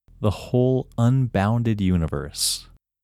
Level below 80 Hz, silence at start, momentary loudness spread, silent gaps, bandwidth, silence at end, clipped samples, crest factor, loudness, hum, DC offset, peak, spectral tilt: -42 dBFS; 0.2 s; 6 LU; none; 15 kHz; 0.4 s; under 0.1%; 16 dB; -22 LUFS; none; under 0.1%; -6 dBFS; -5.5 dB/octave